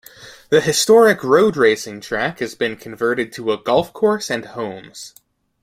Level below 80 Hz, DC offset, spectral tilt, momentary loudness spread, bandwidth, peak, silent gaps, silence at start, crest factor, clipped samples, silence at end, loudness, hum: -56 dBFS; under 0.1%; -3.5 dB/octave; 16 LU; 16 kHz; -2 dBFS; none; 0.2 s; 16 dB; under 0.1%; 0.55 s; -17 LUFS; none